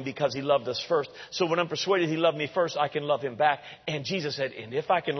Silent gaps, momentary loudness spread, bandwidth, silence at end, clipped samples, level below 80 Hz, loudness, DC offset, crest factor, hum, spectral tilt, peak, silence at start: none; 7 LU; 6.4 kHz; 0 s; under 0.1%; -72 dBFS; -28 LUFS; under 0.1%; 20 dB; none; -5 dB/octave; -8 dBFS; 0 s